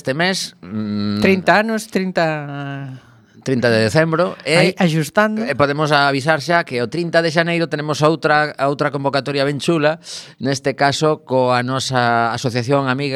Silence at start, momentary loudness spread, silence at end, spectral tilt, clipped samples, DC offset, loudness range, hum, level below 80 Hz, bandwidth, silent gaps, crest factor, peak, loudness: 0.05 s; 9 LU; 0 s; -5 dB/octave; under 0.1%; under 0.1%; 2 LU; none; -58 dBFS; 15 kHz; none; 18 dB; 0 dBFS; -17 LUFS